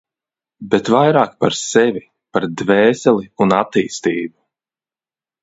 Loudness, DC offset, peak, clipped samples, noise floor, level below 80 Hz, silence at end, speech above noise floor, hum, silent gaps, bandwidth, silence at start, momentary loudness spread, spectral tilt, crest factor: -16 LUFS; under 0.1%; 0 dBFS; under 0.1%; under -90 dBFS; -58 dBFS; 1.15 s; over 75 dB; none; none; 8 kHz; 0.6 s; 9 LU; -5 dB/octave; 16 dB